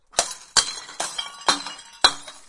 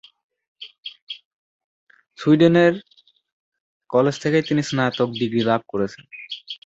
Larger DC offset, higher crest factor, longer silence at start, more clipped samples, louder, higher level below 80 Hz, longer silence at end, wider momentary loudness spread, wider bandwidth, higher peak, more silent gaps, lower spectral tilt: neither; first, 26 dB vs 20 dB; second, 0.15 s vs 0.6 s; neither; about the same, -22 LUFS vs -20 LUFS; first, -54 dBFS vs -62 dBFS; about the same, 0.05 s vs 0.1 s; second, 10 LU vs 21 LU; first, 11.5 kHz vs 8 kHz; first, 0 dBFS vs -4 dBFS; second, none vs 0.78-0.83 s, 1.02-1.07 s, 1.25-1.87 s, 3.32-3.52 s, 3.60-3.80 s; second, 1 dB/octave vs -6.5 dB/octave